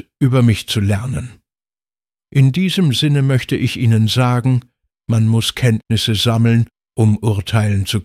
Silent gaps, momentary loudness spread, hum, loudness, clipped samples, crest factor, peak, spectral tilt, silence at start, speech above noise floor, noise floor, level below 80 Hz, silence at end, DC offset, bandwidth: none; 7 LU; none; -16 LUFS; under 0.1%; 14 dB; -2 dBFS; -6 dB/octave; 0.2 s; over 76 dB; under -90 dBFS; -44 dBFS; 0 s; under 0.1%; 15 kHz